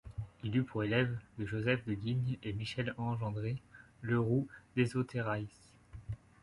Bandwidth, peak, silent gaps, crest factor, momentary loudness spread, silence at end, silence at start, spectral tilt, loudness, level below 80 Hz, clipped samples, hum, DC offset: 11.5 kHz; -16 dBFS; none; 20 dB; 14 LU; 0.25 s; 0.05 s; -7.5 dB/octave; -36 LUFS; -58 dBFS; under 0.1%; none; under 0.1%